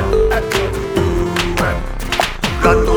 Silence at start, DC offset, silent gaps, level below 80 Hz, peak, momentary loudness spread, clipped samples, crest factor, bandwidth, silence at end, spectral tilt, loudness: 0 s; under 0.1%; none; -22 dBFS; 0 dBFS; 5 LU; under 0.1%; 16 dB; over 20 kHz; 0 s; -5 dB/octave; -17 LUFS